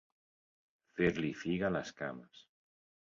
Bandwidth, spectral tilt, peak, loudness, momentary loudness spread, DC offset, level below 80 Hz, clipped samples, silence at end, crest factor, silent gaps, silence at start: 7.4 kHz; -5.5 dB/octave; -18 dBFS; -36 LUFS; 13 LU; under 0.1%; -64 dBFS; under 0.1%; 0.65 s; 20 dB; none; 0.95 s